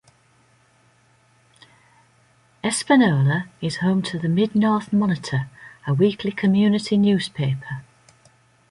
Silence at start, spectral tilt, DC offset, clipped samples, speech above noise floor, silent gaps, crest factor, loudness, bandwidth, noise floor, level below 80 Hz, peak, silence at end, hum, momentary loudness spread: 2.65 s; -6 dB/octave; under 0.1%; under 0.1%; 39 dB; none; 18 dB; -21 LUFS; 11.5 kHz; -59 dBFS; -60 dBFS; -4 dBFS; 0.9 s; none; 11 LU